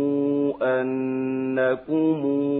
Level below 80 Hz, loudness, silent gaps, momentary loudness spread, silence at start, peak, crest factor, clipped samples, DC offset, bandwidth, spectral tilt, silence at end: -68 dBFS; -24 LUFS; none; 3 LU; 0 s; -10 dBFS; 12 dB; under 0.1%; under 0.1%; 4 kHz; -11.5 dB/octave; 0 s